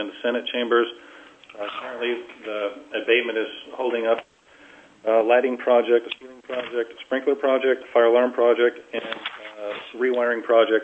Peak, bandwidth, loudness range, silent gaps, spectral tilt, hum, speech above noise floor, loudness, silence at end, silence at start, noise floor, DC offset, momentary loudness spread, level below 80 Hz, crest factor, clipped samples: -4 dBFS; 8 kHz; 5 LU; none; -4.5 dB/octave; none; 28 dB; -23 LUFS; 0 s; 0 s; -51 dBFS; under 0.1%; 14 LU; -74 dBFS; 18 dB; under 0.1%